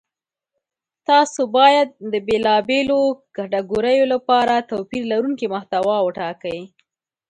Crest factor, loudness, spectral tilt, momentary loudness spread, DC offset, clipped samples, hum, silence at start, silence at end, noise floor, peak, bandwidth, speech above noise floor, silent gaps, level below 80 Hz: 18 dB; -18 LUFS; -4 dB/octave; 12 LU; under 0.1%; under 0.1%; none; 1.1 s; 0.65 s; -87 dBFS; 0 dBFS; 10.5 kHz; 69 dB; none; -58 dBFS